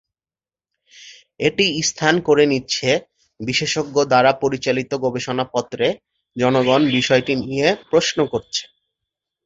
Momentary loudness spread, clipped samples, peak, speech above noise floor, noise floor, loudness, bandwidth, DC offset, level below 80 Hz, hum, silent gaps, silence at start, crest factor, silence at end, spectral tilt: 8 LU; under 0.1%; -2 dBFS; over 72 dB; under -90 dBFS; -18 LUFS; 8 kHz; under 0.1%; -56 dBFS; none; none; 1 s; 18 dB; 0.8 s; -4 dB/octave